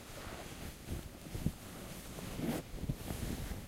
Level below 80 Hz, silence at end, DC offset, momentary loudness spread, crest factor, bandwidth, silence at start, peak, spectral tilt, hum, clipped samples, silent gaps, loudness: -48 dBFS; 0 s; under 0.1%; 7 LU; 22 dB; 16 kHz; 0 s; -20 dBFS; -5 dB/octave; none; under 0.1%; none; -43 LUFS